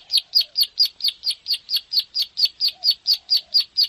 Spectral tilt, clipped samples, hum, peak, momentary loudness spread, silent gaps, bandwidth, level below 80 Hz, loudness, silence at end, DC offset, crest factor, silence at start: 3.5 dB/octave; under 0.1%; none; -8 dBFS; 5 LU; none; 15.5 kHz; -70 dBFS; -19 LUFS; 0 s; under 0.1%; 14 dB; 0.1 s